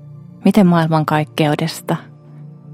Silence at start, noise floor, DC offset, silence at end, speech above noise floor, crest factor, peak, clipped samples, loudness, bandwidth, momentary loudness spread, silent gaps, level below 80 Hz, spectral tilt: 0.05 s; -37 dBFS; under 0.1%; 0 s; 23 dB; 16 dB; 0 dBFS; under 0.1%; -16 LUFS; 16 kHz; 11 LU; none; -56 dBFS; -7 dB/octave